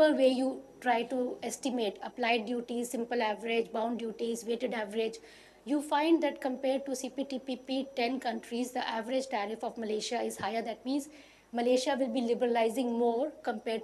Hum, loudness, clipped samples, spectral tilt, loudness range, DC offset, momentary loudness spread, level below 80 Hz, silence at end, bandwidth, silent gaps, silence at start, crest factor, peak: none; -32 LUFS; under 0.1%; -3.5 dB/octave; 3 LU; under 0.1%; 8 LU; -74 dBFS; 0 s; 13 kHz; none; 0 s; 18 dB; -14 dBFS